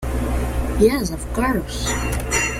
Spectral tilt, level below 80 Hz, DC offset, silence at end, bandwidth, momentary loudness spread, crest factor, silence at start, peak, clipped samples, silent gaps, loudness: -4.5 dB/octave; -26 dBFS; under 0.1%; 0 s; 16.5 kHz; 6 LU; 16 dB; 0 s; -4 dBFS; under 0.1%; none; -21 LUFS